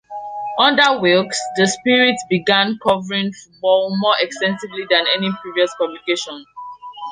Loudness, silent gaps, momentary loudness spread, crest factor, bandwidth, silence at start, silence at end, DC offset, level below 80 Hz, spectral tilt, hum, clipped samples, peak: -17 LUFS; none; 15 LU; 18 dB; 10.5 kHz; 0.1 s; 0 s; under 0.1%; -62 dBFS; -3.5 dB/octave; none; under 0.1%; 0 dBFS